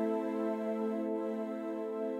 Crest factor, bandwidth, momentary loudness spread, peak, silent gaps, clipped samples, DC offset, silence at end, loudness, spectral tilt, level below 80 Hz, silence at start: 12 dB; 12.5 kHz; 4 LU; -22 dBFS; none; under 0.1%; under 0.1%; 0 s; -36 LUFS; -8 dB/octave; -88 dBFS; 0 s